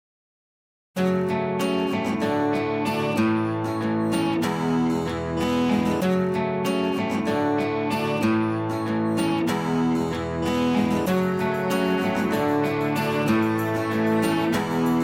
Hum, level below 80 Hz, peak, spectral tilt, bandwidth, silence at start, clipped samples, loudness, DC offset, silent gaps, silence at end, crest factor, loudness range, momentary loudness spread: none; -52 dBFS; -8 dBFS; -6.5 dB/octave; 16.5 kHz; 0.95 s; under 0.1%; -24 LUFS; under 0.1%; none; 0 s; 14 dB; 1 LU; 3 LU